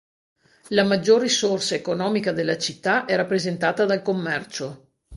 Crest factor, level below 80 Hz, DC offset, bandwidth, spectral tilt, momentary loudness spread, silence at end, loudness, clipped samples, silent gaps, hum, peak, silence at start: 18 dB; -60 dBFS; under 0.1%; 11.5 kHz; -4 dB/octave; 9 LU; 0 s; -22 LUFS; under 0.1%; none; none; -4 dBFS; 0.65 s